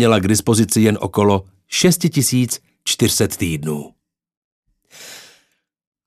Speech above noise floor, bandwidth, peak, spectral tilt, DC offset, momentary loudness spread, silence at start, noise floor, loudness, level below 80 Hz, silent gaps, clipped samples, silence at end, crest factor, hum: 47 dB; 14 kHz; 0 dBFS; -4.5 dB/octave; under 0.1%; 11 LU; 0 s; -63 dBFS; -17 LUFS; -50 dBFS; 4.37-4.63 s; under 0.1%; 0.85 s; 18 dB; none